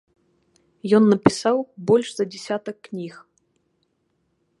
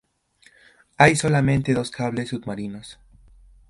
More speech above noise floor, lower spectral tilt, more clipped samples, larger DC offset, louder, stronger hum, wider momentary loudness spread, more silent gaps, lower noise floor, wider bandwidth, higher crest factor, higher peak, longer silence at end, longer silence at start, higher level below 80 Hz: first, 50 dB vs 37 dB; about the same, -6 dB/octave vs -5.5 dB/octave; neither; neither; about the same, -20 LUFS vs -21 LUFS; neither; about the same, 17 LU vs 17 LU; neither; first, -70 dBFS vs -58 dBFS; about the same, 11.5 kHz vs 11.5 kHz; about the same, 22 dB vs 22 dB; about the same, 0 dBFS vs 0 dBFS; first, 1.5 s vs 0.75 s; second, 0.85 s vs 1 s; second, -60 dBFS vs -50 dBFS